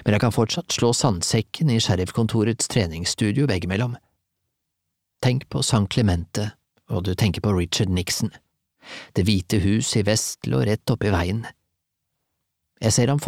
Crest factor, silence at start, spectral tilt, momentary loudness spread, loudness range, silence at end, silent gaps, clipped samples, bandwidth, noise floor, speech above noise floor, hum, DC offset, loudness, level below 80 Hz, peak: 18 dB; 0 s; -5 dB/octave; 9 LU; 3 LU; 0 s; none; under 0.1%; 16 kHz; -79 dBFS; 57 dB; none; under 0.1%; -22 LUFS; -44 dBFS; -6 dBFS